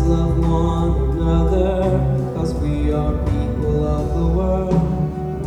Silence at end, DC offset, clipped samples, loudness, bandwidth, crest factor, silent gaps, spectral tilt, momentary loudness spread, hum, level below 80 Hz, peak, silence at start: 0 s; under 0.1%; under 0.1%; -19 LUFS; 9 kHz; 12 dB; none; -9 dB/octave; 3 LU; none; -22 dBFS; -4 dBFS; 0 s